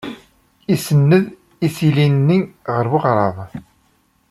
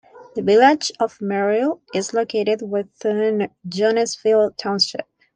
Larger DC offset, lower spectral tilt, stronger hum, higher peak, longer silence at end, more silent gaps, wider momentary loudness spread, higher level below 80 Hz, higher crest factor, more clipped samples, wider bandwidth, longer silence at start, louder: neither; first, -7.5 dB/octave vs -4 dB/octave; neither; about the same, -2 dBFS vs -4 dBFS; first, 0.7 s vs 0.35 s; neither; first, 19 LU vs 10 LU; first, -54 dBFS vs -66 dBFS; about the same, 16 dB vs 16 dB; neither; first, 14 kHz vs 9.8 kHz; about the same, 0.05 s vs 0.15 s; about the same, -17 LUFS vs -19 LUFS